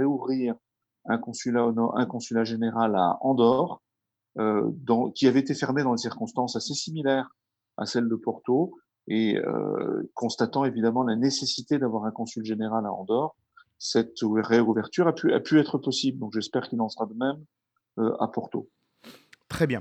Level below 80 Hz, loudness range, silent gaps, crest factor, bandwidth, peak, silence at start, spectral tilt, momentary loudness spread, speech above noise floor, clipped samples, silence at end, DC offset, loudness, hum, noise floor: -68 dBFS; 4 LU; none; 18 dB; 9.4 kHz; -8 dBFS; 0 s; -5.5 dB/octave; 10 LU; 60 dB; under 0.1%; 0 s; under 0.1%; -26 LUFS; none; -85 dBFS